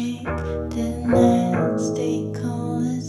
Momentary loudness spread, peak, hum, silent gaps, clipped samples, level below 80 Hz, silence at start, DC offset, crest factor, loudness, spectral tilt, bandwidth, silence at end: 10 LU; -4 dBFS; none; none; under 0.1%; -42 dBFS; 0 s; under 0.1%; 18 dB; -22 LUFS; -7 dB/octave; 12 kHz; 0 s